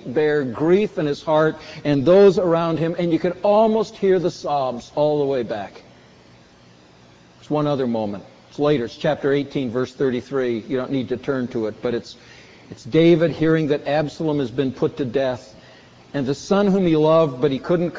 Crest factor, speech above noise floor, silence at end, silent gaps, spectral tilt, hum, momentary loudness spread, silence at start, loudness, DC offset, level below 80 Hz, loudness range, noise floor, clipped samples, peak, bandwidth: 16 dB; 30 dB; 0 s; none; -7.5 dB/octave; none; 10 LU; 0 s; -20 LUFS; under 0.1%; -54 dBFS; 8 LU; -50 dBFS; under 0.1%; -4 dBFS; 7.8 kHz